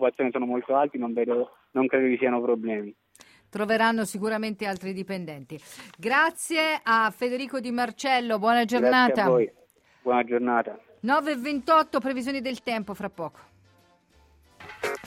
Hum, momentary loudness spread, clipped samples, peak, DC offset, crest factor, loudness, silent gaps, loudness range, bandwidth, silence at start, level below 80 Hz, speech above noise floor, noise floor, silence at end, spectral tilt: none; 13 LU; under 0.1%; -8 dBFS; under 0.1%; 18 dB; -25 LUFS; none; 5 LU; 16 kHz; 0 s; -68 dBFS; 36 dB; -61 dBFS; 0 s; -4.5 dB/octave